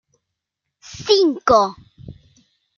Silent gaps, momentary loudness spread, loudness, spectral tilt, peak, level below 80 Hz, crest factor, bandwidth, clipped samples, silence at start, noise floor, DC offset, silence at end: none; 16 LU; -16 LUFS; -4 dB/octave; -2 dBFS; -52 dBFS; 20 dB; 7.2 kHz; under 0.1%; 0.9 s; -80 dBFS; under 0.1%; 0.65 s